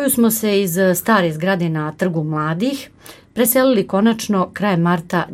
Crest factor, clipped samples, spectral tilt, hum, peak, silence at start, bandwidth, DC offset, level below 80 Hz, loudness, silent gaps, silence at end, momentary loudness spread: 14 dB; under 0.1%; -5 dB/octave; none; -2 dBFS; 0 s; 16.5 kHz; under 0.1%; -56 dBFS; -17 LUFS; none; 0 s; 7 LU